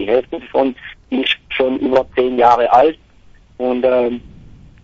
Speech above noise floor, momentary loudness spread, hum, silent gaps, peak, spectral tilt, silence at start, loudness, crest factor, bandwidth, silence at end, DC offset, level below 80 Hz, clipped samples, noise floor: 31 dB; 11 LU; none; none; 0 dBFS; -6 dB/octave; 0 s; -15 LUFS; 16 dB; 7.4 kHz; 0.55 s; under 0.1%; -46 dBFS; under 0.1%; -46 dBFS